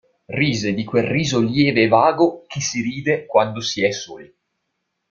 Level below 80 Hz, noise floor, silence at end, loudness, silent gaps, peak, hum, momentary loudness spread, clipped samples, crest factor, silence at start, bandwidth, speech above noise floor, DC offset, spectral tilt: -54 dBFS; -75 dBFS; 0.85 s; -19 LUFS; none; -2 dBFS; none; 9 LU; under 0.1%; 18 dB; 0.3 s; 7.6 kHz; 56 dB; under 0.1%; -5 dB/octave